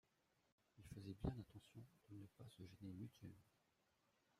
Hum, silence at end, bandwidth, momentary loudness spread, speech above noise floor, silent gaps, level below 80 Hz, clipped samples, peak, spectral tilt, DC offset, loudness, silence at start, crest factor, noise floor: none; 0.95 s; 15.5 kHz; 14 LU; 29 dB; none; -68 dBFS; under 0.1%; -34 dBFS; -7.5 dB/octave; under 0.1%; -57 LUFS; 0.75 s; 24 dB; -84 dBFS